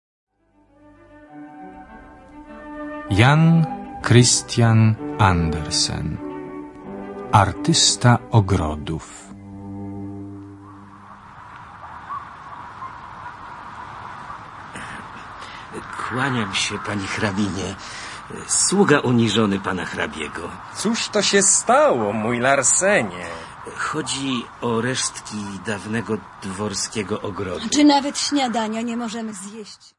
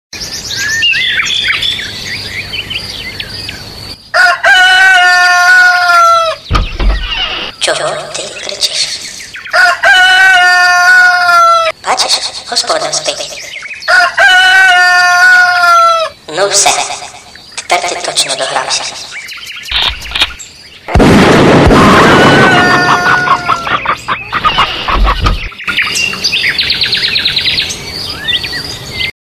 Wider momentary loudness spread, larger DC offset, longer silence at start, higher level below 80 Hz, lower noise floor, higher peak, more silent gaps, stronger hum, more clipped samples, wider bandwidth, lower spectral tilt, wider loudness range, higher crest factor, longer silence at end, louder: first, 21 LU vs 15 LU; neither; first, 1.15 s vs 0.15 s; second, -48 dBFS vs -24 dBFS; first, -58 dBFS vs -32 dBFS; about the same, 0 dBFS vs 0 dBFS; neither; neither; second, under 0.1% vs 0.6%; second, 11.5 kHz vs 14.5 kHz; first, -4 dB/octave vs -2.5 dB/octave; first, 18 LU vs 7 LU; first, 22 dB vs 10 dB; first, 0.25 s vs 0.1 s; second, -19 LUFS vs -8 LUFS